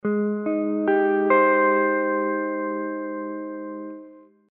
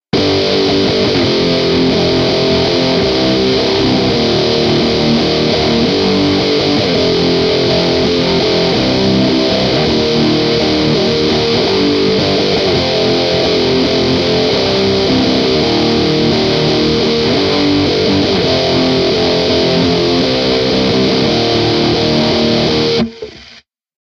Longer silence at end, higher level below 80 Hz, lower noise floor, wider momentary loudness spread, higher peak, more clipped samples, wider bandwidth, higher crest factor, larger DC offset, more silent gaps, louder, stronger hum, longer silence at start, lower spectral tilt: second, 0.3 s vs 0.45 s; second, -80 dBFS vs -34 dBFS; first, -47 dBFS vs -42 dBFS; first, 16 LU vs 0 LU; second, -8 dBFS vs 0 dBFS; neither; second, 3.9 kHz vs 9.8 kHz; about the same, 16 dB vs 12 dB; neither; neither; second, -22 LUFS vs -12 LUFS; neither; about the same, 0.05 s vs 0.15 s; about the same, -6 dB/octave vs -5.5 dB/octave